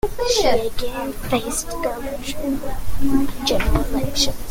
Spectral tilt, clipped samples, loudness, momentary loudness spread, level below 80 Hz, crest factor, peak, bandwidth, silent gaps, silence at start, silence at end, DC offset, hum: -4 dB/octave; under 0.1%; -22 LUFS; 9 LU; -28 dBFS; 14 dB; -4 dBFS; 17 kHz; none; 0.05 s; 0 s; under 0.1%; none